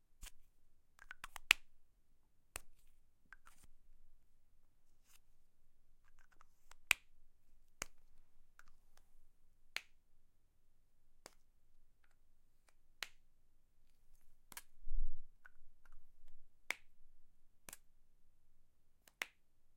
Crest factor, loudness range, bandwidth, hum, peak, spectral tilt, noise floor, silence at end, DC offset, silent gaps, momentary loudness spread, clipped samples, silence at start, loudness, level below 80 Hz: 38 dB; 16 LU; 16 kHz; none; -6 dBFS; 0 dB/octave; -67 dBFS; 0.05 s; under 0.1%; none; 27 LU; under 0.1%; 0.2 s; -42 LUFS; -54 dBFS